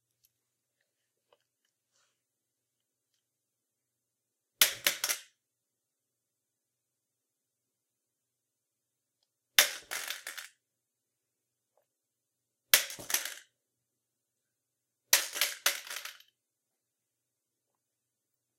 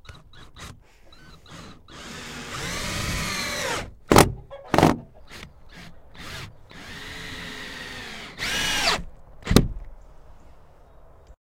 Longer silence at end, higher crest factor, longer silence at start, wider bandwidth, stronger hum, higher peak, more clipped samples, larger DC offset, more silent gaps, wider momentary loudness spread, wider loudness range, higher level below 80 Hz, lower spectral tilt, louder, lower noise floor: first, 2.45 s vs 0.1 s; first, 36 dB vs 28 dB; first, 4.6 s vs 0.05 s; about the same, 16 kHz vs 16 kHz; neither; second, -4 dBFS vs 0 dBFS; neither; neither; neither; second, 16 LU vs 24 LU; second, 3 LU vs 11 LU; second, -80 dBFS vs -38 dBFS; second, 2.5 dB/octave vs -4 dB/octave; second, -29 LUFS vs -24 LUFS; first, -86 dBFS vs -49 dBFS